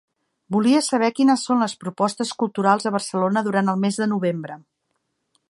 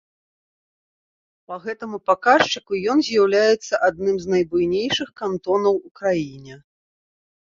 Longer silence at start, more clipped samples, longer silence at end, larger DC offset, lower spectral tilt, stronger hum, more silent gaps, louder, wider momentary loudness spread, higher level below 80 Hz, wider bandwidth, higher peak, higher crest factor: second, 0.5 s vs 1.5 s; neither; about the same, 0.9 s vs 1 s; neither; about the same, -5 dB/octave vs -4.5 dB/octave; neither; second, none vs 5.91-5.95 s; about the same, -21 LUFS vs -20 LUFS; second, 8 LU vs 13 LU; second, -70 dBFS vs -60 dBFS; first, 11.5 kHz vs 7.6 kHz; about the same, -2 dBFS vs -2 dBFS; about the same, 18 dB vs 20 dB